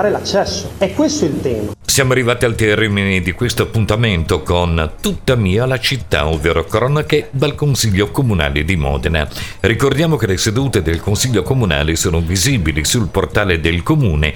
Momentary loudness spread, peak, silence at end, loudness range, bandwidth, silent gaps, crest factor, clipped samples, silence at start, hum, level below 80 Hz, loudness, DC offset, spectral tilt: 4 LU; 0 dBFS; 0 s; 1 LU; 19 kHz; none; 14 dB; under 0.1%; 0 s; none; -28 dBFS; -15 LUFS; 1%; -4.5 dB/octave